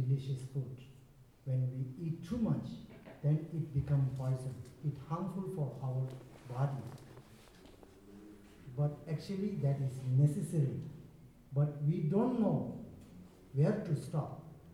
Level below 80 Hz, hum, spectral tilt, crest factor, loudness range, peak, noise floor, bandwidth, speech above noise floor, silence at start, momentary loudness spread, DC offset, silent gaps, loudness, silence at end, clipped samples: -64 dBFS; none; -9 dB/octave; 18 dB; 7 LU; -18 dBFS; -60 dBFS; 11.5 kHz; 26 dB; 0 s; 21 LU; under 0.1%; none; -37 LUFS; 0 s; under 0.1%